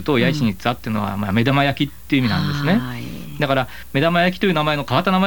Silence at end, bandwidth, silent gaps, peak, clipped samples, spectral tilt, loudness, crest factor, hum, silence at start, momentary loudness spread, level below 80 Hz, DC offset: 0 s; over 20 kHz; none; 0 dBFS; under 0.1%; -6.5 dB/octave; -19 LUFS; 18 dB; none; 0 s; 7 LU; -42 dBFS; 2%